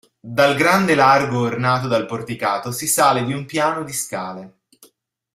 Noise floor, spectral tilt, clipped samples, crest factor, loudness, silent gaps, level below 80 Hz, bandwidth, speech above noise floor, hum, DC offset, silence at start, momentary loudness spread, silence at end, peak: -58 dBFS; -4 dB/octave; under 0.1%; 18 dB; -18 LUFS; none; -58 dBFS; 16 kHz; 39 dB; none; under 0.1%; 0.25 s; 12 LU; 0.85 s; -2 dBFS